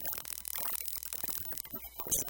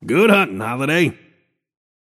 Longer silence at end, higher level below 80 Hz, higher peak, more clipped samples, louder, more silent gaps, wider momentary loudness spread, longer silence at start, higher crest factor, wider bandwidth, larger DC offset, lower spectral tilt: second, 0 s vs 1.05 s; about the same, -60 dBFS vs -64 dBFS; second, -16 dBFS vs 0 dBFS; neither; second, -36 LUFS vs -17 LUFS; neither; about the same, 6 LU vs 8 LU; about the same, 0 s vs 0 s; first, 24 dB vs 18 dB; first, 17.5 kHz vs 14.5 kHz; neither; second, -1 dB/octave vs -5.5 dB/octave